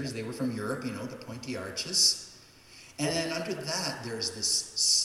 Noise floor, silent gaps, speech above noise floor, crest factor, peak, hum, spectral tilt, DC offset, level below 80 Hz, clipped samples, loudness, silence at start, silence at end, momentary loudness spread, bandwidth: -53 dBFS; none; 22 dB; 20 dB; -12 dBFS; none; -2 dB/octave; under 0.1%; -68 dBFS; under 0.1%; -29 LUFS; 0 s; 0 s; 16 LU; 16.5 kHz